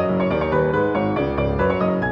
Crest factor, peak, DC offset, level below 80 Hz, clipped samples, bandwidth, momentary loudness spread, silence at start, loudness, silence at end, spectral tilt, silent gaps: 12 dB; -8 dBFS; under 0.1%; -36 dBFS; under 0.1%; 5.8 kHz; 2 LU; 0 s; -20 LUFS; 0 s; -9.5 dB/octave; none